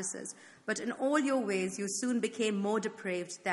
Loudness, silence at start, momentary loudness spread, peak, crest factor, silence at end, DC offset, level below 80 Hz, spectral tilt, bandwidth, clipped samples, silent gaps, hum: -33 LUFS; 0 s; 8 LU; -16 dBFS; 18 dB; 0 s; under 0.1%; -80 dBFS; -4 dB/octave; 11.5 kHz; under 0.1%; none; none